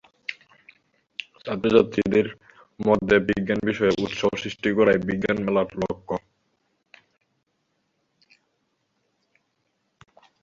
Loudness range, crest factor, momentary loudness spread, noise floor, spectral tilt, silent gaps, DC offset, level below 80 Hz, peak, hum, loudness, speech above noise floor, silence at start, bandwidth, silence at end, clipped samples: 10 LU; 22 dB; 16 LU; -73 dBFS; -6.5 dB/octave; none; under 0.1%; -54 dBFS; -4 dBFS; none; -23 LUFS; 51 dB; 0.3 s; 7.6 kHz; 4.25 s; under 0.1%